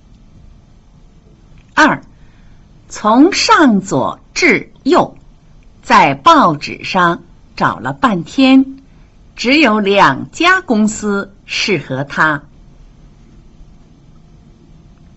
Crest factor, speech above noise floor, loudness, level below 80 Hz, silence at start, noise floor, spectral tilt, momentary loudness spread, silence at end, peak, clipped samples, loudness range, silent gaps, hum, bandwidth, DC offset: 14 dB; 31 dB; -12 LUFS; -44 dBFS; 1.75 s; -43 dBFS; -4.5 dB/octave; 12 LU; 1.55 s; 0 dBFS; under 0.1%; 7 LU; none; none; 8.2 kHz; under 0.1%